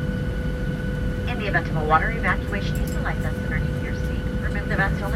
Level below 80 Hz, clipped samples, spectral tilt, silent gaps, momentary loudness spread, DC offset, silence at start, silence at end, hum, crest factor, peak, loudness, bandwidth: -30 dBFS; under 0.1%; -7 dB/octave; none; 7 LU; under 0.1%; 0 s; 0 s; none; 20 dB; -4 dBFS; -24 LUFS; 15.5 kHz